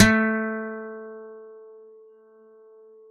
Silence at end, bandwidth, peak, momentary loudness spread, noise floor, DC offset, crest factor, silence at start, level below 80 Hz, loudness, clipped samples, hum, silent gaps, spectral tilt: 1.45 s; 6.8 kHz; 0 dBFS; 26 LU; -53 dBFS; under 0.1%; 26 dB; 0 s; -48 dBFS; -25 LUFS; under 0.1%; none; none; -4 dB/octave